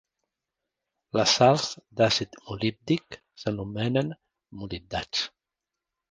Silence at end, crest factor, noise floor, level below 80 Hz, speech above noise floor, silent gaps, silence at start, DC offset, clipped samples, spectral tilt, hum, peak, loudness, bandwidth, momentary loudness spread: 0.85 s; 24 dB; -88 dBFS; -56 dBFS; 61 dB; none; 1.15 s; under 0.1%; under 0.1%; -4.5 dB/octave; none; -4 dBFS; -26 LUFS; 10 kHz; 17 LU